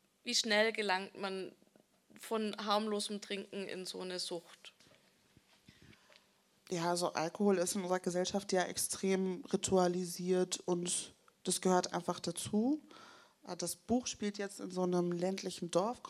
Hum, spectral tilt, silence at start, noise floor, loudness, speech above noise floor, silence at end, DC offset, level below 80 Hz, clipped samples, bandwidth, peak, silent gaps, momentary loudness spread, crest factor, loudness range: none; -4 dB/octave; 0.25 s; -71 dBFS; -36 LUFS; 35 dB; 0 s; under 0.1%; -74 dBFS; under 0.1%; 15 kHz; -16 dBFS; none; 11 LU; 22 dB; 8 LU